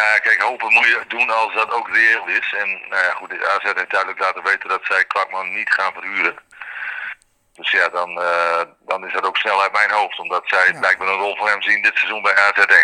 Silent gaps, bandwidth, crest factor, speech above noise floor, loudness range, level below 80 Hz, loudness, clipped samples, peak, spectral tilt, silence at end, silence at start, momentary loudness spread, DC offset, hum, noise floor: none; 11.5 kHz; 18 dB; 20 dB; 5 LU; -72 dBFS; -17 LUFS; under 0.1%; 0 dBFS; -1 dB/octave; 0 s; 0 s; 9 LU; under 0.1%; none; -38 dBFS